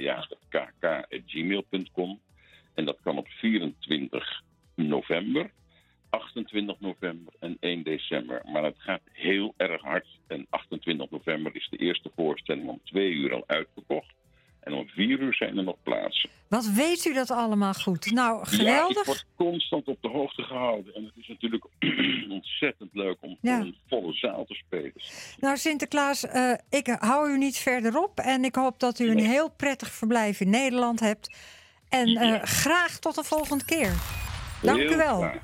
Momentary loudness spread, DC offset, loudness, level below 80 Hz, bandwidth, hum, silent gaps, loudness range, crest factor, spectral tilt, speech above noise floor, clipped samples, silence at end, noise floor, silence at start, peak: 11 LU; under 0.1%; -27 LUFS; -52 dBFS; 16.5 kHz; none; none; 7 LU; 20 dB; -4 dB/octave; 37 dB; under 0.1%; 0 s; -63 dBFS; 0 s; -8 dBFS